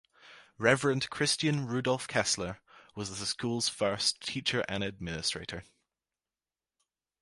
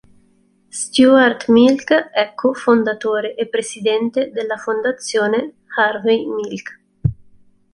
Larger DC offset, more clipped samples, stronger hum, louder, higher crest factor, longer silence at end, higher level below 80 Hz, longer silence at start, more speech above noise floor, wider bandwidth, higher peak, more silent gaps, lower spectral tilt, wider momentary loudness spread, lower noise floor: neither; neither; neither; second, -31 LUFS vs -17 LUFS; first, 26 dB vs 16 dB; first, 1.6 s vs 0.6 s; second, -60 dBFS vs -46 dBFS; second, 0.25 s vs 0.75 s; first, over 58 dB vs 40 dB; about the same, 11.5 kHz vs 11.5 kHz; second, -8 dBFS vs -2 dBFS; neither; about the same, -3.5 dB/octave vs -4.5 dB/octave; about the same, 12 LU vs 12 LU; first, under -90 dBFS vs -57 dBFS